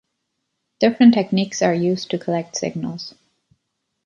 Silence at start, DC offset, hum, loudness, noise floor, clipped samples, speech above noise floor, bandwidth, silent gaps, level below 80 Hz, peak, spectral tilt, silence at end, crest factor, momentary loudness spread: 0.8 s; under 0.1%; none; -19 LUFS; -75 dBFS; under 0.1%; 57 dB; 7.6 kHz; none; -64 dBFS; -2 dBFS; -5.5 dB/octave; 0.95 s; 18 dB; 15 LU